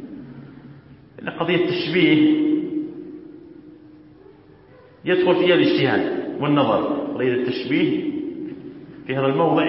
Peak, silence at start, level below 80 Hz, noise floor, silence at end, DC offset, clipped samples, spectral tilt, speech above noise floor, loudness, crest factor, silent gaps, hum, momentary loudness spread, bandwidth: -4 dBFS; 0 s; -62 dBFS; -48 dBFS; 0 s; under 0.1%; under 0.1%; -10.5 dB/octave; 30 dB; -20 LUFS; 18 dB; none; none; 21 LU; 5.8 kHz